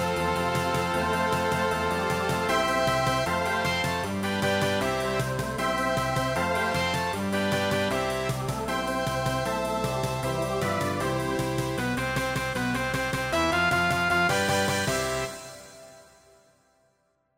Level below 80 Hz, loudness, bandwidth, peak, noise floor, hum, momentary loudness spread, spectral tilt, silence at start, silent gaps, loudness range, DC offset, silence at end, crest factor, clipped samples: -46 dBFS; -26 LUFS; 16 kHz; -12 dBFS; -70 dBFS; none; 5 LU; -4.5 dB/octave; 0 s; none; 3 LU; under 0.1%; 1.35 s; 14 dB; under 0.1%